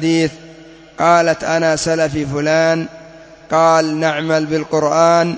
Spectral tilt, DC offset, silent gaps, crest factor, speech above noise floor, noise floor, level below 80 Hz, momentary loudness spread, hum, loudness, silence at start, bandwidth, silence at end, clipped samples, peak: -5 dB/octave; under 0.1%; none; 16 dB; 25 dB; -39 dBFS; -48 dBFS; 7 LU; none; -15 LUFS; 0 s; 8 kHz; 0 s; under 0.1%; 0 dBFS